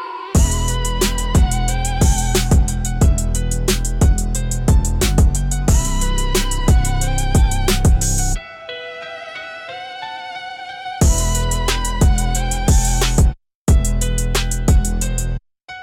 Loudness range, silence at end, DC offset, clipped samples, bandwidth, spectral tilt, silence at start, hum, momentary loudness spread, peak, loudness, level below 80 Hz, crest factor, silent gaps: 5 LU; 0 s; under 0.1%; under 0.1%; 17 kHz; -4.5 dB/octave; 0 s; none; 13 LU; -4 dBFS; -18 LUFS; -18 dBFS; 12 dB; 13.55-13.66 s